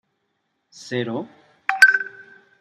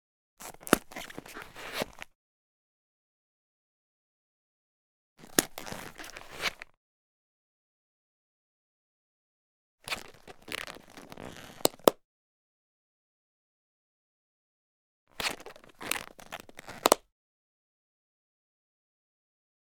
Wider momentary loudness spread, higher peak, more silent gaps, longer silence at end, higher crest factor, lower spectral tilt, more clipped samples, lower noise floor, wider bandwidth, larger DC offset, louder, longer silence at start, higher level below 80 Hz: second, 19 LU vs 22 LU; about the same, -2 dBFS vs 0 dBFS; second, none vs 2.15-5.16 s, 6.77-9.78 s, 12.05-15.07 s; second, 0.4 s vs 2.8 s; second, 22 dB vs 38 dB; about the same, -3 dB/octave vs -2 dB/octave; neither; second, -73 dBFS vs under -90 dBFS; second, 15.5 kHz vs 19.5 kHz; neither; first, -18 LUFS vs -32 LUFS; first, 0.8 s vs 0.4 s; second, -80 dBFS vs -62 dBFS